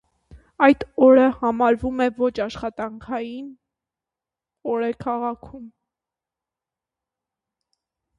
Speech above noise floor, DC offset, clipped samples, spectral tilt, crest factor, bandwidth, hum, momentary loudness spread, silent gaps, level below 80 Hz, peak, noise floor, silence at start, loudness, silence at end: 68 dB; under 0.1%; under 0.1%; -7 dB/octave; 22 dB; 7.6 kHz; none; 19 LU; none; -52 dBFS; -2 dBFS; -89 dBFS; 0.35 s; -20 LUFS; 2.5 s